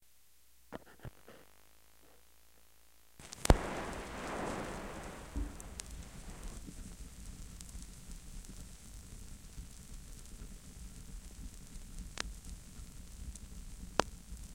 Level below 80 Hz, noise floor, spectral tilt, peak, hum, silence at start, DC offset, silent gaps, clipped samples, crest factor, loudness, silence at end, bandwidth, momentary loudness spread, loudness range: -46 dBFS; -68 dBFS; -4.5 dB/octave; -6 dBFS; none; 0 s; under 0.1%; none; under 0.1%; 38 dB; -43 LUFS; 0 s; 17 kHz; 17 LU; 13 LU